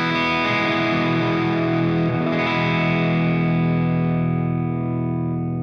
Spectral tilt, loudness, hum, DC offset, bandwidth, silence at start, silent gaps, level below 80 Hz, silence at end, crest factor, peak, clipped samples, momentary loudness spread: -7.5 dB/octave; -20 LUFS; none; under 0.1%; 6.6 kHz; 0 s; none; -52 dBFS; 0 s; 12 dB; -8 dBFS; under 0.1%; 5 LU